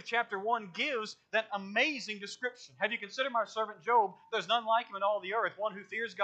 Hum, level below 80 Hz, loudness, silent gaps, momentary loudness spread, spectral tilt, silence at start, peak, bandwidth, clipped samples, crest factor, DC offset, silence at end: none; under -90 dBFS; -33 LUFS; none; 9 LU; -3 dB/octave; 0.05 s; -14 dBFS; 8.8 kHz; under 0.1%; 18 dB; under 0.1%; 0 s